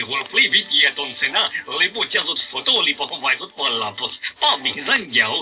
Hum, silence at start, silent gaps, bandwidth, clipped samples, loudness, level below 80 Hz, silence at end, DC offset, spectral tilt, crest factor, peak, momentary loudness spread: none; 0 s; none; 4 kHz; under 0.1%; -18 LUFS; -66 dBFS; 0 s; under 0.1%; 2.5 dB/octave; 18 dB; -2 dBFS; 7 LU